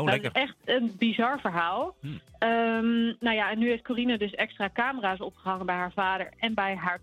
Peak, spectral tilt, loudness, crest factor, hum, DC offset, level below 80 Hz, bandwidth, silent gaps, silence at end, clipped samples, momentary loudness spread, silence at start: -8 dBFS; -6 dB/octave; -28 LUFS; 20 dB; none; under 0.1%; -62 dBFS; 9.8 kHz; none; 0.05 s; under 0.1%; 6 LU; 0 s